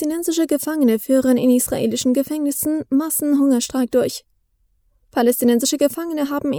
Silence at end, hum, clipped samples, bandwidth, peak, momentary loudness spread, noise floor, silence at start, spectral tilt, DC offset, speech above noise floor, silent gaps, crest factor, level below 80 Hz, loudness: 0 s; none; under 0.1%; over 20 kHz; -4 dBFS; 6 LU; -63 dBFS; 0 s; -4 dB/octave; under 0.1%; 45 dB; none; 14 dB; -54 dBFS; -18 LUFS